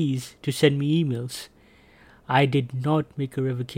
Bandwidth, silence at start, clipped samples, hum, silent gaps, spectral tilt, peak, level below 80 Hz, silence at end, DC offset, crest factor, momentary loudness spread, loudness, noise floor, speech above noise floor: 16 kHz; 0 s; under 0.1%; none; none; -6.5 dB/octave; -4 dBFS; -60 dBFS; 0 s; under 0.1%; 20 dB; 11 LU; -24 LUFS; -54 dBFS; 30 dB